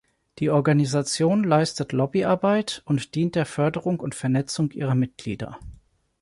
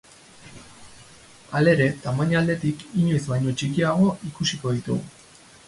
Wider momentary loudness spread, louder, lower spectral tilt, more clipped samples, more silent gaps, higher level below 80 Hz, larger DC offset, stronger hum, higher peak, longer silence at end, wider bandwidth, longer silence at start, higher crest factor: about the same, 8 LU vs 10 LU; about the same, -23 LUFS vs -23 LUFS; about the same, -6 dB/octave vs -6 dB/octave; neither; neither; about the same, -54 dBFS vs -54 dBFS; neither; neither; about the same, -8 dBFS vs -6 dBFS; about the same, 0.5 s vs 0.55 s; about the same, 11.5 kHz vs 11.5 kHz; about the same, 0.4 s vs 0.45 s; about the same, 16 dB vs 18 dB